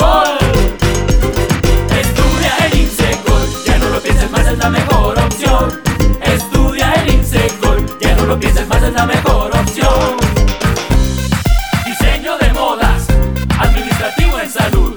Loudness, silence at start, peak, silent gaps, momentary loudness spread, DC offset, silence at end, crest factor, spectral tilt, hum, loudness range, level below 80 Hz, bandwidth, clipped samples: -13 LUFS; 0 s; 0 dBFS; none; 3 LU; under 0.1%; 0 s; 12 dB; -5 dB/octave; none; 1 LU; -14 dBFS; over 20 kHz; under 0.1%